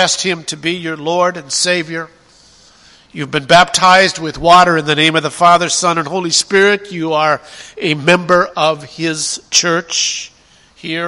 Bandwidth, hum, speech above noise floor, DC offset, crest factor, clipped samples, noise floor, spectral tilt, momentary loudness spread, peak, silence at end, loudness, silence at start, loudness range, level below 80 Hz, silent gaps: 16 kHz; none; 34 dB; under 0.1%; 14 dB; 0.2%; -47 dBFS; -2.5 dB/octave; 13 LU; 0 dBFS; 0 s; -12 LUFS; 0 s; 5 LU; -48 dBFS; none